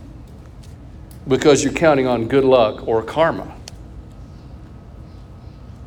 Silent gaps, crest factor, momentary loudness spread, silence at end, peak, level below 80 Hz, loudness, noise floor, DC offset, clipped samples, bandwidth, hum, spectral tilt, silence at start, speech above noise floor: none; 18 dB; 25 LU; 0 s; -2 dBFS; -40 dBFS; -16 LUFS; -38 dBFS; under 0.1%; under 0.1%; 15.5 kHz; none; -5 dB/octave; 0 s; 22 dB